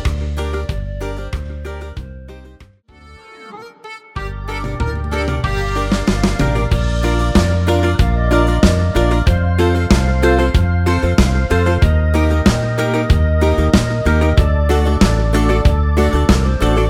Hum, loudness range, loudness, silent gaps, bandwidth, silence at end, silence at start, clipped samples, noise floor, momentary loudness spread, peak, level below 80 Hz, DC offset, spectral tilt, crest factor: none; 14 LU; -16 LUFS; none; 15 kHz; 0 s; 0 s; under 0.1%; -44 dBFS; 14 LU; 0 dBFS; -18 dBFS; under 0.1%; -6.5 dB/octave; 14 dB